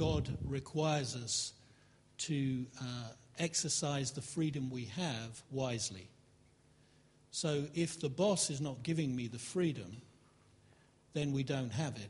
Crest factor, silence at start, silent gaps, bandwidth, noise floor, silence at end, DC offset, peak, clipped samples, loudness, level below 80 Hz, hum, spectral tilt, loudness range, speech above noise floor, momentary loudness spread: 18 dB; 0 s; none; 11.5 kHz; -67 dBFS; 0 s; under 0.1%; -20 dBFS; under 0.1%; -37 LUFS; -60 dBFS; none; -4.5 dB/octave; 4 LU; 30 dB; 10 LU